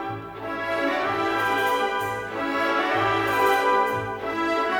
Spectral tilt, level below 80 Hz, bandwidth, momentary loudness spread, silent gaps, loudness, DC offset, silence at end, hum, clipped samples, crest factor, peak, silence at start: -4.5 dB/octave; -56 dBFS; 19 kHz; 8 LU; none; -24 LUFS; under 0.1%; 0 s; none; under 0.1%; 14 dB; -10 dBFS; 0 s